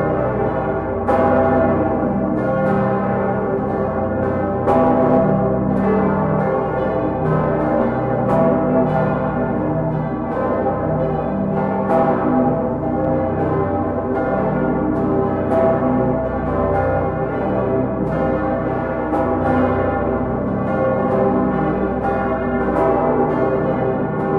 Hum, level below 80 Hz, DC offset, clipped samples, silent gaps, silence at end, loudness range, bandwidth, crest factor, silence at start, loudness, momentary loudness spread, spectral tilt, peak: none; -36 dBFS; under 0.1%; under 0.1%; none; 0 s; 2 LU; 5 kHz; 14 dB; 0 s; -18 LUFS; 5 LU; -10.5 dB/octave; -4 dBFS